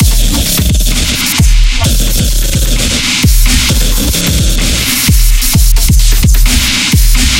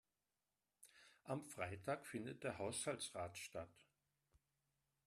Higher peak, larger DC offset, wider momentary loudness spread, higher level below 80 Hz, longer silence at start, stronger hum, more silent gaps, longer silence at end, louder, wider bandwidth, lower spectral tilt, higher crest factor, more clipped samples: first, 0 dBFS vs -30 dBFS; neither; second, 2 LU vs 20 LU; first, -10 dBFS vs -82 dBFS; second, 0 s vs 0.8 s; neither; neither; second, 0 s vs 1.25 s; first, -9 LUFS vs -48 LUFS; first, 17 kHz vs 14 kHz; about the same, -3 dB/octave vs -4 dB/octave; second, 8 dB vs 22 dB; first, 0.2% vs under 0.1%